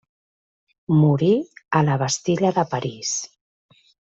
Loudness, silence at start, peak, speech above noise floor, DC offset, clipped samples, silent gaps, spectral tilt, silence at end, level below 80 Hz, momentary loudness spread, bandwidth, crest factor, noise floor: -21 LUFS; 0.9 s; -4 dBFS; over 70 dB; under 0.1%; under 0.1%; none; -5.5 dB/octave; 0.9 s; -60 dBFS; 9 LU; 8 kHz; 18 dB; under -90 dBFS